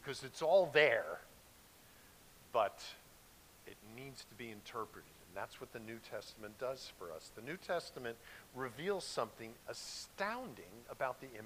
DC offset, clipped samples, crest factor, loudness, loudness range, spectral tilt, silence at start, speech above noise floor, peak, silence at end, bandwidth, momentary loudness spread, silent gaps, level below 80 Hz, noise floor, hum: under 0.1%; under 0.1%; 26 dB; -40 LUFS; 13 LU; -3.5 dB/octave; 0 s; 22 dB; -14 dBFS; 0 s; 15.5 kHz; 26 LU; none; -72 dBFS; -63 dBFS; none